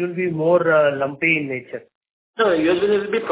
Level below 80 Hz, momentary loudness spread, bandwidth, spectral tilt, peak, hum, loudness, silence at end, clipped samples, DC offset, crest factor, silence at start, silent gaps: -60 dBFS; 15 LU; 4 kHz; -9.5 dB/octave; -4 dBFS; none; -18 LUFS; 0 s; under 0.1%; under 0.1%; 16 dB; 0 s; 1.95-2.01 s, 2.13-2.34 s